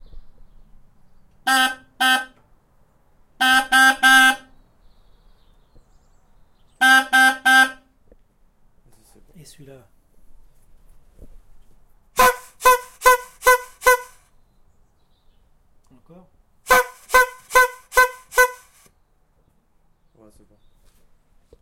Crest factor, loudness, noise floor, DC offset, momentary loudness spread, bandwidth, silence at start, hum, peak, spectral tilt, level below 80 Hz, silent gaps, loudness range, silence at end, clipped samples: 20 dB; -16 LUFS; -61 dBFS; under 0.1%; 8 LU; 16.5 kHz; 0.15 s; none; -2 dBFS; -0.5 dB/octave; -48 dBFS; none; 6 LU; 3.1 s; under 0.1%